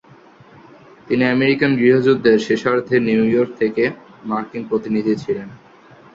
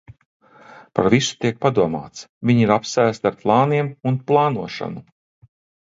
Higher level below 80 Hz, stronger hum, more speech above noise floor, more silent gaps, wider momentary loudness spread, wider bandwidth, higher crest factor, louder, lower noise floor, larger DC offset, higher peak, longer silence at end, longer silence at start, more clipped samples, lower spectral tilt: about the same, -58 dBFS vs -54 dBFS; neither; about the same, 29 dB vs 27 dB; second, none vs 2.29-2.41 s; about the same, 11 LU vs 13 LU; about the same, 7.6 kHz vs 7.8 kHz; about the same, 16 dB vs 20 dB; about the same, -17 LUFS vs -19 LUFS; about the same, -46 dBFS vs -46 dBFS; neither; about the same, -2 dBFS vs 0 dBFS; second, 0.6 s vs 0.85 s; first, 1.05 s vs 0.75 s; neither; about the same, -7 dB/octave vs -6 dB/octave